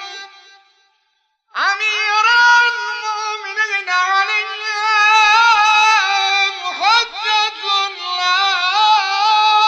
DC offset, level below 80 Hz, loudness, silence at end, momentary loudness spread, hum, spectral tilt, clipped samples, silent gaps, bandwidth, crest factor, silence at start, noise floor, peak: under 0.1%; -62 dBFS; -14 LUFS; 0 s; 11 LU; none; 3 dB/octave; under 0.1%; none; 8.8 kHz; 14 dB; 0 s; -66 dBFS; -2 dBFS